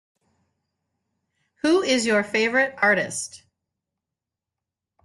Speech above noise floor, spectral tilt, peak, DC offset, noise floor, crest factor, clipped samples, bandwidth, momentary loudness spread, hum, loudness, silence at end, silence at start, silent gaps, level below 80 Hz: 65 dB; -3 dB/octave; -6 dBFS; under 0.1%; -87 dBFS; 18 dB; under 0.1%; 12.5 kHz; 9 LU; none; -21 LUFS; 1.65 s; 1.65 s; none; -68 dBFS